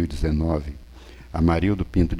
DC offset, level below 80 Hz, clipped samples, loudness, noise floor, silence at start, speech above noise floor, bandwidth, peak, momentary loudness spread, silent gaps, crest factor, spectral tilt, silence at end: under 0.1%; -30 dBFS; under 0.1%; -23 LUFS; -43 dBFS; 0 s; 21 dB; 11.5 kHz; -6 dBFS; 15 LU; none; 16 dB; -8.5 dB/octave; 0 s